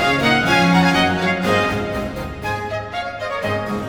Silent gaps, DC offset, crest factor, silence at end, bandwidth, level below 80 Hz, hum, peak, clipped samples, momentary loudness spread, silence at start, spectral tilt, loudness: none; under 0.1%; 16 dB; 0 s; 18.5 kHz; -40 dBFS; none; -2 dBFS; under 0.1%; 11 LU; 0 s; -5 dB/octave; -18 LUFS